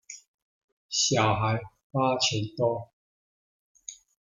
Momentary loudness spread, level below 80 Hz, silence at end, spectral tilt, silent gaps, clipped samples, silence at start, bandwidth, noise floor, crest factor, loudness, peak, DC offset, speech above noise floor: 21 LU; -62 dBFS; 0.4 s; -3.5 dB/octave; 0.28-0.89 s, 1.84-1.90 s, 2.93-3.75 s; under 0.1%; 0.1 s; 9.8 kHz; under -90 dBFS; 22 dB; -27 LUFS; -8 dBFS; under 0.1%; over 64 dB